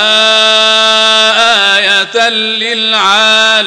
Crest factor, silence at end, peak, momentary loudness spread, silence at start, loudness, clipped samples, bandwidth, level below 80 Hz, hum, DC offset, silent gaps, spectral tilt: 8 dB; 0 s; 0 dBFS; 4 LU; 0 s; -6 LUFS; 0.6%; 16 kHz; -58 dBFS; none; 0.6%; none; 0 dB/octave